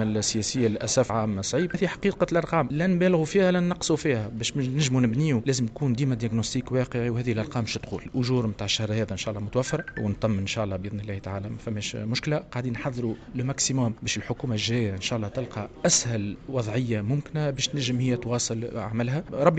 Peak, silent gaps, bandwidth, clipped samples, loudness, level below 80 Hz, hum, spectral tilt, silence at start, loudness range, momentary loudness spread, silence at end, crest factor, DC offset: -6 dBFS; none; 9.2 kHz; under 0.1%; -26 LUFS; -50 dBFS; none; -5 dB/octave; 0 s; 5 LU; 8 LU; 0 s; 20 dB; under 0.1%